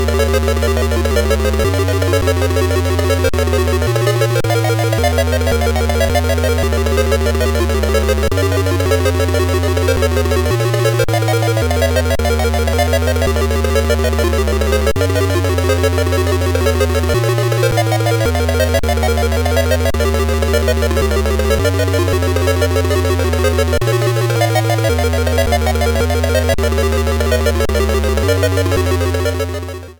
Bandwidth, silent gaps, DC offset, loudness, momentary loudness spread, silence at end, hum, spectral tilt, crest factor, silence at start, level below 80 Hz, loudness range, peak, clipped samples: over 20 kHz; none; under 0.1%; -15 LUFS; 1 LU; 0.05 s; none; -5.5 dB/octave; 10 dB; 0 s; -20 dBFS; 0 LU; -4 dBFS; under 0.1%